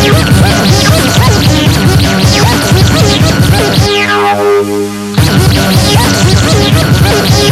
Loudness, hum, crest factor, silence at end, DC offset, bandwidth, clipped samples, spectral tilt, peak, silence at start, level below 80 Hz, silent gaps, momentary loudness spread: -7 LUFS; none; 6 dB; 0 s; under 0.1%; 16 kHz; 2%; -5 dB/octave; 0 dBFS; 0 s; -20 dBFS; none; 2 LU